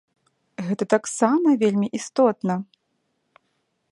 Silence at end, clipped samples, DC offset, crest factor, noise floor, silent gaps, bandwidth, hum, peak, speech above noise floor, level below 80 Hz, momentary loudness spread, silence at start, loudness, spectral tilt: 1.3 s; under 0.1%; under 0.1%; 20 dB; -73 dBFS; none; 11.5 kHz; none; -4 dBFS; 52 dB; -70 dBFS; 13 LU; 0.6 s; -22 LUFS; -6 dB/octave